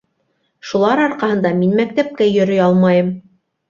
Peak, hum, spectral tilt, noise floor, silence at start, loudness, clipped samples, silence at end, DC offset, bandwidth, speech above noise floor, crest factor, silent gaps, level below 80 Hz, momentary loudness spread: -2 dBFS; none; -7.5 dB/octave; -66 dBFS; 0.65 s; -15 LUFS; under 0.1%; 0.5 s; under 0.1%; 7.2 kHz; 52 dB; 14 dB; none; -58 dBFS; 10 LU